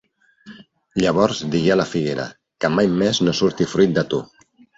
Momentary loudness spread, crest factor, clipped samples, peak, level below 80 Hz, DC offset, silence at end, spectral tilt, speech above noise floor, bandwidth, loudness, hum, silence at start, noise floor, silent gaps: 8 LU; 18 dB; under 0.1%; -4 dBFS; -52 dBFS; under 0.1%; 0.55 s; -5.5 dB/octave; 27 dB; 8 kHz; -19 LUFS; none; 0.45 s; -46 dBFS; none